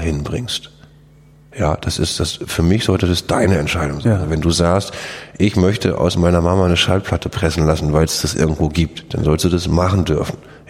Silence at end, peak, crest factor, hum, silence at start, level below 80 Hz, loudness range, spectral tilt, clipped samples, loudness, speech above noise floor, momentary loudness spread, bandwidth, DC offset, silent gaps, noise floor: 0.1 s; -2 dBFS; 16 dB; none; 0 s; -30 dBFS; 2 LU; -5.5 dB/octave; under 0.1%; -17 LUFS; 29 dB; 7 LU; 16 kHz; under 0.1%; none; -46 dBFS